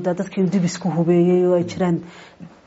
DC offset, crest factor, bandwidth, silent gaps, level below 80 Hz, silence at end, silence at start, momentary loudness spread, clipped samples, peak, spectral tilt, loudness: under 0.1%; 14 dB; 8 kHz; none; -60 dBFS; 0.2 s; 0 s; 6 LU; under 0.1%; -6 dBFS; -8 dB/octave; -19 LUFS